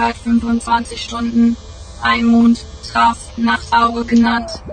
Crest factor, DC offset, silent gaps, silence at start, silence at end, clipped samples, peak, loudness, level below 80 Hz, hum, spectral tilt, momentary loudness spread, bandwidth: 14 dB; under 0.1%; none; 0 s; 0 s; under 0.1%; -2 dBFS; -15 LUFS; -36 dBFS; none; -4.5 dB/octave; 9 LU; 9.4 kHz